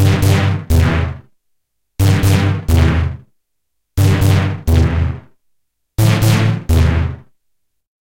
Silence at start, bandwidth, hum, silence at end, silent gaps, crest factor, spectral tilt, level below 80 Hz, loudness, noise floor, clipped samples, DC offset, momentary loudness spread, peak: 0 s; 17 kHz; none; 0.85 s; none; 12 dB; -6 dB/octave; -24 dBFS; -15 LUFS; -71 dBFS; under 0.1%; under 0.1%; 12 LU; -2 dBFS